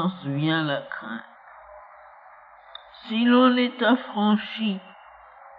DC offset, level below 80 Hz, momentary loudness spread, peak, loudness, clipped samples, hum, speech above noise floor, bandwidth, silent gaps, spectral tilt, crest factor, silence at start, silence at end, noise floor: under 0.1%; -70 dBFS; 22 LU; -8 dBFS; -23 LUFS; under 0.1%; none; 27 dB; 4.9 kHz; none; -9 dB/octave; 18 dB; 0 s; 0.1 s; -49 dBFS